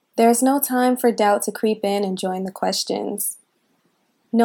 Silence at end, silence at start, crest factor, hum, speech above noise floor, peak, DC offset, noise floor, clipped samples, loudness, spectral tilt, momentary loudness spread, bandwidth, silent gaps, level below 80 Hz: 0 s; 0.15 s; 18 dB; none; 46 dB; -4 dBFS; under 0.1%; -66 dBFS; under 0.1%; -20 LUFS; -4 dB/octave; 8 LU; 18 kHz; none; -76 dBFS